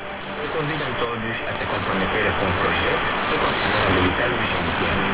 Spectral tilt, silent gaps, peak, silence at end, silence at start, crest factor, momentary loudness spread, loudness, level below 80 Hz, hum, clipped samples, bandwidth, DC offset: -9 dB/octave; none; -6 dBFS; 0 s; 0 s; 16 dB; 7 LU; -22 LUFS; -40 dBFS; none; under 0.1%; 5.2 kHz; under 0.1%